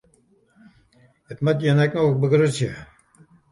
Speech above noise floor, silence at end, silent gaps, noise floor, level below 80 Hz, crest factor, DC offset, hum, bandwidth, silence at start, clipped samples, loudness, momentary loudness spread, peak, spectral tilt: 41 dB; 0.65 s; none; -60 dBFS; -58 dBFS; 16 dB; under 0.1%; none; 11.5 kHz; 1.3 s; under 0.1%; -20 LUFS; 14 LU; -6 dBFS; -7 dB/octave